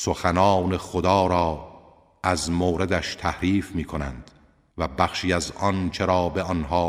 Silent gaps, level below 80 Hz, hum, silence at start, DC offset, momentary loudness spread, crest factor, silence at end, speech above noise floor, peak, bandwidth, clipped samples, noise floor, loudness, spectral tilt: none; -42 dBFS; none; 0 s; under 0.1%; 11 LU; 20 dB; 0 s; 28 dB; -2 dBFS; 15 kHz; under 0.1%; -51 dBFS; -24 LUFS; -5.5 dB/octave